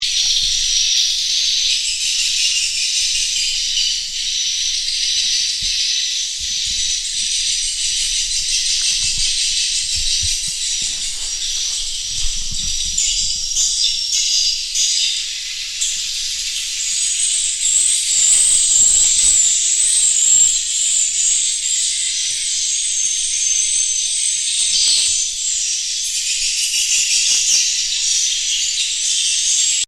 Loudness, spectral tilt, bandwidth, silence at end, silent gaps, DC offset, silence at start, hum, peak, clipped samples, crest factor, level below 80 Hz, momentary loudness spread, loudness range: -14 LUFS; 4 dB/octave; 16.5 kHz; 0 s; none; under 0.1%; 0 s; none; -2 dBFS; under 0.1%; 16 dB; -38 dBFS; 8 LU; 6 LU